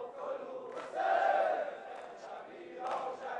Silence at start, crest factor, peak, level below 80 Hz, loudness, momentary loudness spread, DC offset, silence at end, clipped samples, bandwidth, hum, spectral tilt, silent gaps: 0 s; 16 dB; -20 dBFS; -86 dBFS; -35 LUFS; 17 LU; under 0.1%; 0 s; under 0.1%; 10 kHz; none; -3.5 dB/octave; none